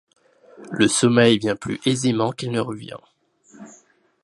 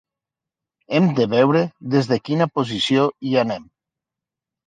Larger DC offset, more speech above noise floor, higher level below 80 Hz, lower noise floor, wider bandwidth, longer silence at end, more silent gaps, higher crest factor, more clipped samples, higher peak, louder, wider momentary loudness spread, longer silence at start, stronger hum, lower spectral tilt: neither; second, 36 dB vs 68 dB; about the same, -60 dBFS vs -62 dBFS; second, -56 dBFS vs -87 dBFS; first, 11.5 kHz vs 9.4 kHz; second, 0.55 s vs 1.05 s; neither; about the same, 20 dB vs 18 dB; neither; about the same, -2 dBFS vs -4 dBFS; about the same, -20 LUFS vs -19 LUFS; first, 18 LU vs 5 LU; second, 0.6 s vs 0.9 s; neither; second, -4.5 dB/octave vs -6.5 dB/octave